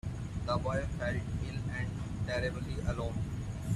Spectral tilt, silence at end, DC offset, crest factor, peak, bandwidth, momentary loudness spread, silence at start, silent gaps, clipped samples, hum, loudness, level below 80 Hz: -6.5 dB/octave; 0 s; under 0.1%; 16 dB; -20 dBFS; 12.5 kHz; 5 LU; 0.05 s; none; under 0.1%; none; -36 LUFS; -44 dBFS